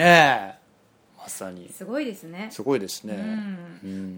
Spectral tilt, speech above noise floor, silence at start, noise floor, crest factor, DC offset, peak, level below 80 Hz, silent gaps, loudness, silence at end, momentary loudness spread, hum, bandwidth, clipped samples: -4.5 dB/octave; 36 dB; 0 s; -59 dBFS; 24 dB; under 0.1%; 0 dBFS; -66 dBFS; none; -24 LUFS; 0 s; 19 LU; none; over 20 kHz; under 0.1%